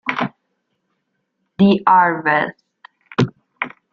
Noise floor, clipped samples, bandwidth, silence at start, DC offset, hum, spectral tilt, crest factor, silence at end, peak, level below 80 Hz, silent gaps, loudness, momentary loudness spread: -71 dBFS; under 0.1%; 6.8 kHz; 0.05 s; under 0.1%; none; -7.5 dB/octave; 18 dB; 0.25 s; -2 dBFS; -60 dBFS; none; -17 LUFS; 15 LU